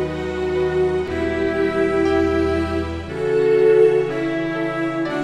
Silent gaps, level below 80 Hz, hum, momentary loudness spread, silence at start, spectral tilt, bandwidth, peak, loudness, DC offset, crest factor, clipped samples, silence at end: none; -38 dBFS; none; 9 LU; 0 s; -7 dB/octave; 10.5 kHz; -4 dBFS; -19 LUFS; 0.4%; 14 dB; under 0.1%; 0 s